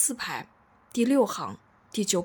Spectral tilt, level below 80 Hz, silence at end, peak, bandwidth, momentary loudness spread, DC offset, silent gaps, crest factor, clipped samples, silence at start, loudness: -3.5 dB/octave; -70 dBFS; 0 s; -10 dBFS; 19.5 kHz; 14 LU; under 0.1%; none; 18 dB; under 0.1%; 0 s; -28 LUFS